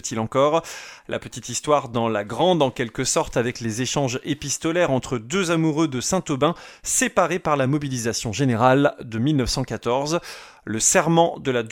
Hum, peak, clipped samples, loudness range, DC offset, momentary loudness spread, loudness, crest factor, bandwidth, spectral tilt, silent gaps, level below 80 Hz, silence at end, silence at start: none; -4 dBFS; under 0.1%; 2 LU; under 0.1%; 10 LU; -22 LUFS; 18 dB; 17.5 kHz; -4 dB/octave; none; -48 dBFS; 0 s; 0.05 s